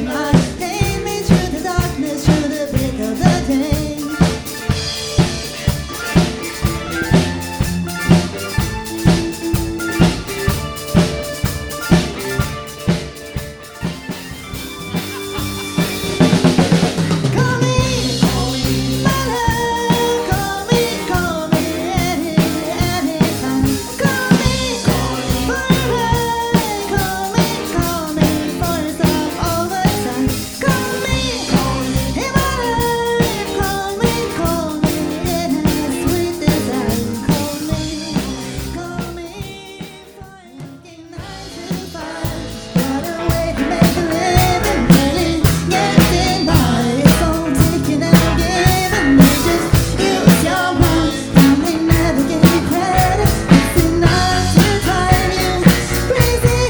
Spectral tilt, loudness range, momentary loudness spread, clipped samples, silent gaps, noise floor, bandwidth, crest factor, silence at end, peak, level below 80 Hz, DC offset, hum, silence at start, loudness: -5 dB/octave; 8 LU; 11 LU; under 0.1%; none; -38 dBFS; over 20 kHz; 16 dB; 0 s; 0 dBFS; -28 dBFS; under 0.1%; none; 0 s; -16 LUFS